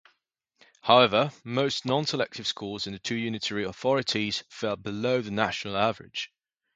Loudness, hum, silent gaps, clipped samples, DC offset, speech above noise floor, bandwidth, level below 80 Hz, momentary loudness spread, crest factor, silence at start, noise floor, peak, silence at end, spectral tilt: -27 LUFS; none; none; under 0.1%; under 0.1%; 49 dB; 9.4 kHz; -62 dBFS; 12 LU; 24 dB; 0.85 s; -76 dBFS; -4 dBFS; 0.5 s; -4.5 dB/octave